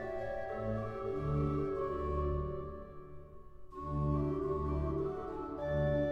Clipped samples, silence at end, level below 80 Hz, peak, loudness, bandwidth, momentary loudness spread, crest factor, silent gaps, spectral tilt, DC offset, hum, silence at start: under 0.1%; 0 s; -44 dBFS; -22 dBFS; -37 LUFS; 6.2 kHz; 16 LU; 14 dB; none; -10 dB/octave; under 0.1%; none; 0 s